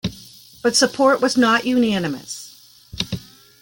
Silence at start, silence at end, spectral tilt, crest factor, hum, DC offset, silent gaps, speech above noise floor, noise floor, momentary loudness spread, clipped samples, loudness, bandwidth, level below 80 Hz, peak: 0.05 s; 0.4 s; -3.5 dB/octave; 18 dB; none; under 0.1%; none; 27 dB; -44 dBFS; 17 LU; under 0.1%; -18 LUFS; 17 kHz; -50 dBFS; -2 dBFS